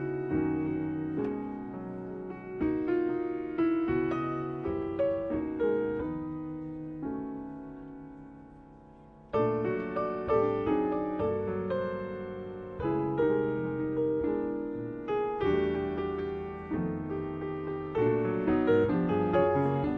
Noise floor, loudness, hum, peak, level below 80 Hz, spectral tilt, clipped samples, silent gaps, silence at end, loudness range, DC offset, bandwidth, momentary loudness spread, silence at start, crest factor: -53 dBFS; -31 LUFS; none; -14 dBFS; -54 dBFS; -10 dB/octave; under 0.1%; none; 0 s; 5 LU; under 0.1%; 5.2 kHz; 12 LU; 0 s; 16 dB